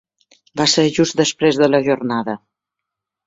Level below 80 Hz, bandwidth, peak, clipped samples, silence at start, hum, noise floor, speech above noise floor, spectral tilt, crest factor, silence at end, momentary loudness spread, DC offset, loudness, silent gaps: -58 dBFS; 8 kHz; -2 dBFS; under 0.1%; 0.55 s; none; -82 dBFS; 66 dB; -4 dB/octave; 16 dB; 0.9 s; 13 LU; under 0.1%; -16 LUFS; none